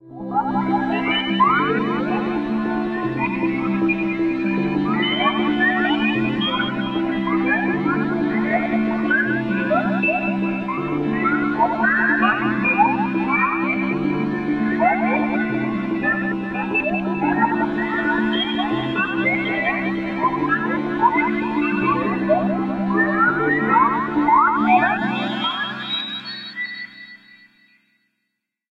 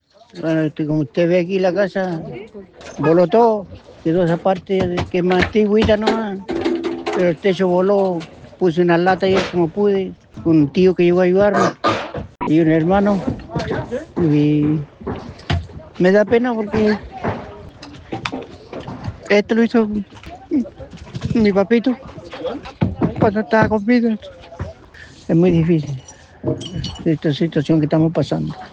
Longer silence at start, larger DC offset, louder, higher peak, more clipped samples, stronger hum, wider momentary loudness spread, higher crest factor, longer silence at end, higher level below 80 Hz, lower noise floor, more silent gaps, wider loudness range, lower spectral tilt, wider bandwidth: second, 0.05 s vs 0.35 s; neither; second, -20 LUFS vs -17 LUFS; about the same, -4 dBFS vs -2 dBFS; neither; neither; second, 6 LU vs 17 LU; about the same, 16 dB vs 16 dB; first, 1.55 s vs 0.05 s; second, -50 dBFS vs -42 dBFS; first, -77 dBFS vs -41 dBFS; neither; about the same, 3 LU vs 5 LU; about the same, -7.5 dB/octave vs -7.5 dB/octave; second, 6.2 kHz vs 8.6 kHz